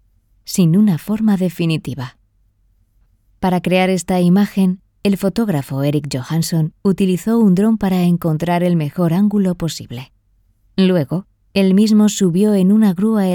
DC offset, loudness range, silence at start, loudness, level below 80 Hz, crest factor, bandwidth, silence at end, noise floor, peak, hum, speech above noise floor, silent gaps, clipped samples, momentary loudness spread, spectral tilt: under 0.1%; 3 LU; 0.5 s; -16 LUFS; -48 dBFS; 14 dB; 18 kHz; 0 s; -57 dBFS; -2 dBFS; none; 43 dB; none; under 0.1%; 10 LU; -6.5 dB/octave